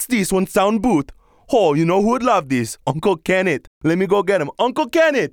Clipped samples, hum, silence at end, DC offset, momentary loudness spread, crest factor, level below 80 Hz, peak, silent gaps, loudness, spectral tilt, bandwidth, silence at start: under 0.1%; none; 0.05 s; under 0.1%; 6 LU; 16 dB; -46 dBFS; -2 dBFS; 3.67-3.81 s; -18 LUFS; -5.5 dB/octave; 19 kHz; 0 s